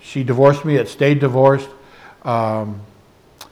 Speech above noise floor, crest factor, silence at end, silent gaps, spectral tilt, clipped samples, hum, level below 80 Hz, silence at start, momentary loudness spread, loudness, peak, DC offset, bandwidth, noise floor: 30 dB; 16 dB; 0.1 s; none; -7.5 dB/octave; under 0.1%; none; -58 dBFS; 0.05 s; 16 LU; -16 LUFS; 0 dBFS; under 0.1%; 13 kHz; -45 dBFS